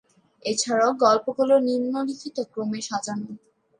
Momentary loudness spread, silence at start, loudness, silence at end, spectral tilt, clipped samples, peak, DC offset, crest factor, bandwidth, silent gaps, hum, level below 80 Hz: 13 LU; 0.45 s; -24 LUFS; 0.4 s; -3.5 dB/octave; under 0.1%; -6 dBFS; under 0.1%; 18 dB; 10.5 kHz; none; none; -76 dBFS